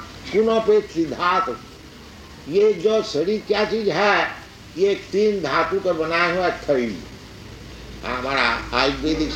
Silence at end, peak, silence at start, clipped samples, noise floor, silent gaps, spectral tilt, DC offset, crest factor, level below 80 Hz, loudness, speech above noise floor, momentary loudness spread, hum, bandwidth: 0 s; -2 dBFS; 0 s; under 0.1%; -41 dBFS; none; -5 dB/octave; under 0.1%; 20 dB; -44 dBFS; -20 LUFS; 21 dB; 21 LU; none; 9.8 kHz